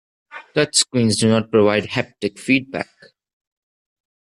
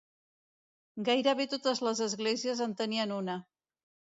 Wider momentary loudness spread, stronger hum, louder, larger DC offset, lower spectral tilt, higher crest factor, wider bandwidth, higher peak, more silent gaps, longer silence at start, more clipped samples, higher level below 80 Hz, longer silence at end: first, 13 LU vs 9 LU; neither; first, -18 LUFS vs -32 LUFS; neither; about the same, -4 dB/octave vs -3.5 dB/octave; about the same, 20 dB vs 20 dB; first, 12.5 kHz vs 7.8 kHz; first, -2 dBFS vs -14 dBFS; neither; second, 0.35 s vs 0.95 s; neither; first, -58 dBFS vs -82 dBFS; first, 1.55 s vs 0.75 s